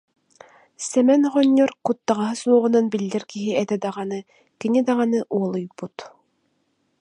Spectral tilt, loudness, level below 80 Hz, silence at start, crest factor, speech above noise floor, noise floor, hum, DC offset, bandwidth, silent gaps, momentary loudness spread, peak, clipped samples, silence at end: -5.5 dB/octave; -21 LUFS; -72 dBFS; 0.8 s; 18 dB; 48 dB; -69 dBFS; none; under 0.1%; 11 kHz; none; 15 LU; -4 dBFS; under 0.1%; 0.9 s